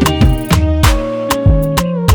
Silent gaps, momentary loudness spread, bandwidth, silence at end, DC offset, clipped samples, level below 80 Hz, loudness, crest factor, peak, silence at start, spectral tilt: none; 4 LU; over 20 kHz; 0 s; under 0.1%; under 0.1%; -16 dBFS; -13 LUFS; 10 dB; 0 dBFS; 0 s; -5.5 dB/octave